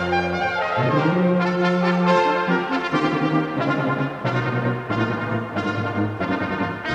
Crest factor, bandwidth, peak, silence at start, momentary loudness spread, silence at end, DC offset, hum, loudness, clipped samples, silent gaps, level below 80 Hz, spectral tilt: 16 dB; 8.4 kHz; -6 dBFS; 0 s; 6 LU; 0 s; under 0.1%; none; -21 LUFS; under 0.1%; none; -54 dBFS; -7 dB/octave